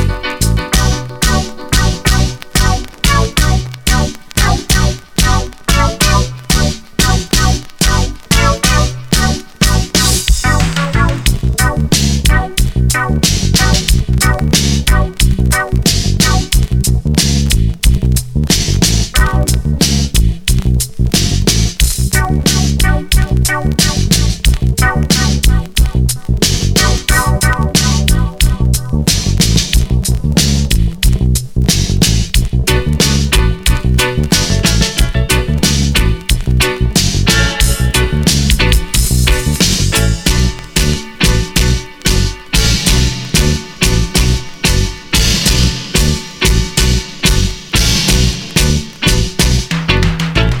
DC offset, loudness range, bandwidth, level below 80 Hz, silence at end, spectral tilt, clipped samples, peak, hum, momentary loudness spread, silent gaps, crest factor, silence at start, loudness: under 0.1%; 1 LU; 19.5 kHz; -16 dBFS; 0 s; -3.5 dB/octave; under 0.1%; 0 dBFS; none; 4 LU; none; 12 dB; 0 s; -12 LUFS